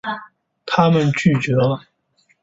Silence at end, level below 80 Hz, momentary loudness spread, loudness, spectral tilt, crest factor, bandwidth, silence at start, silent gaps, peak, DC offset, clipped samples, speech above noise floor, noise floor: 0.65 s; -52 dBFS; 14 LU; -18 LUFS; -7 dB/octave; 16 dB; 8 kHz; 0.05 s; none; -2 dBFS; under 0.1%; under 0.1%; 45 dB; -62 dBFS